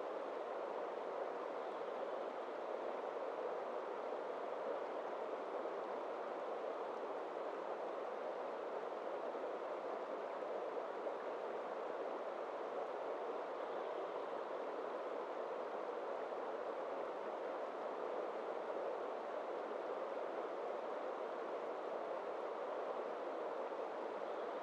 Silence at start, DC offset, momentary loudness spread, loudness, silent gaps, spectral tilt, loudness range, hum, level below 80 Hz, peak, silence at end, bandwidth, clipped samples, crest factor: 0 s; under 0.1%; 1 LU; -45 LUFS; none; -4.5 dB/octave; 0 LU; none; under -90 dBFS; -32 dBFS; 0 s; 10 kHz; under 0.1%; 14 dB